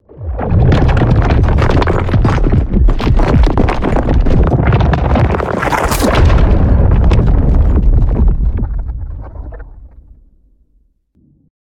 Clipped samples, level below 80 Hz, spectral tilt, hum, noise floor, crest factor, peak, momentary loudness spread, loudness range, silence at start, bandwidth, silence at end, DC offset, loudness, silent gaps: under 0.1%; -14 dBFS; -7.5 dB/octave; none; -54 dBFS; 10 dB; 0 dBFS; 10 LU; 7 LU; 0.15 s; 15.5 kHz; 1.8 s; under 0.1%; -12 LUFS; none